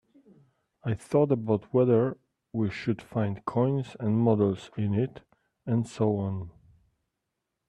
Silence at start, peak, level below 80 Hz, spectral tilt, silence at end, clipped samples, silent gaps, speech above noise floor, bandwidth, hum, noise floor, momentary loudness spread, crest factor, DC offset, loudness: 0.85 s; -10 dBFS; -64 dBFS; -9 dB/octave; 1.2 s; under 0.1%; none; 57 dB; 11 kHz; none; -83 dBFS; 11 LU; 18 dB; under 0.1%; -28 LUFS